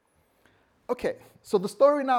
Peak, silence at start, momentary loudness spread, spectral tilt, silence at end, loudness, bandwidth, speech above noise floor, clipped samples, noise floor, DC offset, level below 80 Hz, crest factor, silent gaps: -10 dBFS; 0.9 s; 19 LU; -5.5 dB/octave; 0 s; -26 LUFS; 14 kHz; 40 dB; under 0.1%; -65 dBFS; under 0.1%; -64 dBFS; 18 dB; none